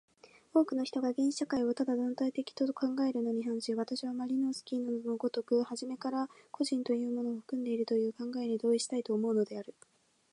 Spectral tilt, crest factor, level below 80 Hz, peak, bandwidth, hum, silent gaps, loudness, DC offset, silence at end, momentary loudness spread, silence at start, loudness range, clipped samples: -5 dB/octave; 18 dB; -80 dBFS; -16 dBFS; 11 kHz; none; none; -34 LUFS; under 0.1%; 0.6 s; 6 LU; 0.55 s; 2 LU; under 0.1%